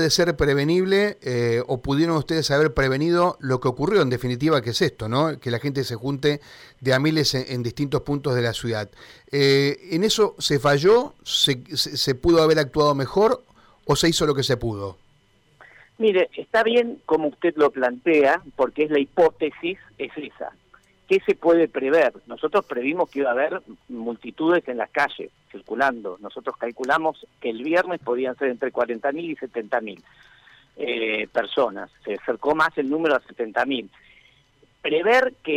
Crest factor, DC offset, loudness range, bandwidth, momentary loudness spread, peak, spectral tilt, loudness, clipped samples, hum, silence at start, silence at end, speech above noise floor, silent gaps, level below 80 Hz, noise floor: 14 dB; under 0.1%; 6 LU; 16.5 kHz; 12 LU; -10 dBFS; -5 dB/octave; -22 LUFS; under 0.1%; none; 0 s; 0 s; 38 dB; none; -50 dBFS; -60 dBFS